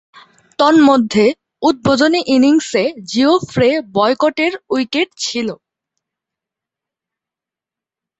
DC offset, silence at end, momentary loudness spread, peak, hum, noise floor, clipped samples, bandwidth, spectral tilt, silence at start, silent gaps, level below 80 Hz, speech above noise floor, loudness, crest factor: under 0.1%; 2.65 s; 9 LU; 0 dBFS; none; -87 dBFS; under 0.1%; 8.2 kHz; -4.5 dB/octave; 0.6 s; none; -52 dBFS; 74 dB; -14 LUFS; 14 dB